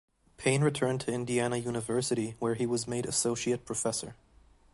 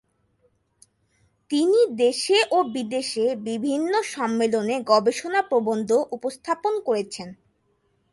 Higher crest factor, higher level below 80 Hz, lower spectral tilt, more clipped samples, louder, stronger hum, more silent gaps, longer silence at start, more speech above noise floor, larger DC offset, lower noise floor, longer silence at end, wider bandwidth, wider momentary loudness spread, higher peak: about the same, 20 dB vs 18 dB; first, -62 dBFS vs -70 dBFS; about the same, -4.5 dB/octave vs -3.5 dB/octave; neither; second, -31 LUFS vs -23 LUFS; neither; neither; second, 0.4 s vs 1.5 s; second, 30 dB vs 46 dB; neither; second, -61 dBFS vs -68 dBFS; second, 0.6 s vs 0.8 s; about the same, 11.5 kHz vs 11.5 kHz; about the same, 6 LU vs 8 LU; second, -12 dBFS vs -6 dBFS